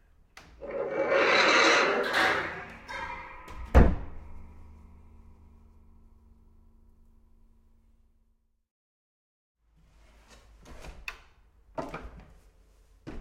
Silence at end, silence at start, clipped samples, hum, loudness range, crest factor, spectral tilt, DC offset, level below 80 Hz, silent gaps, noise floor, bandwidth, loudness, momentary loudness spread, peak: 0 s; 0.6 s; under 0.1%; none; 25 LU; 24 dB; -4.5 dB/octave; under 0.1%; -38 dBFS; 8.71-9.55 s; -70 dBFS; 14 kHz; -25 LUFS; 26 LU; -6 dBFS